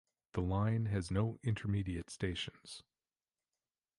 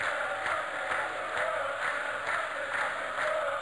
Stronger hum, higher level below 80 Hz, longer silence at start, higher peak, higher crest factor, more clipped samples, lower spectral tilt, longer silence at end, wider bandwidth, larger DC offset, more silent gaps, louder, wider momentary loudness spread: neither; first, -52 dBFS vs -68 dBFS; first, 0.35 s vs 0 s; about the same, -20 dBFS vs -18 dBFS; about the same, 18 dB vs 14 dB; neither; first, -6.5 dB/octave vs -2 dB/octave; first, 1.15 s vs 0 s; about the same, 11.5 kHz vs 11 kHz; neither; neither; second, -38 LUFS vs -31 LUFS; first, 12 LU vs 2 LU